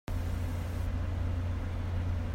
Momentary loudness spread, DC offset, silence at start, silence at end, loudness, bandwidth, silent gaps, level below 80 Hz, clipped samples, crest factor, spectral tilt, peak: 2 LU; under 0.1%; 0.1 s; 0 s; -35 LUFS; 15.5 kHz; none; -38 dBFS; under 0.1%; 10 dB; -7.5 dB/octave; -22 dBFS